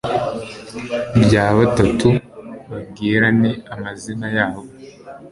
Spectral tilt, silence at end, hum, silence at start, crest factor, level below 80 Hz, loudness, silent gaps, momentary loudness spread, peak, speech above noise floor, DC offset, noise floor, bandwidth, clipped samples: -6.5 dB/octave; 0.05 s; none; 0.05 s; 16 dB; -40 dBFS; -17 LUFS; none; 19 LU; -2 dBFS; 21 dB; under 0.1%; -38 dBFS; 11.5 kHz; under 0.1%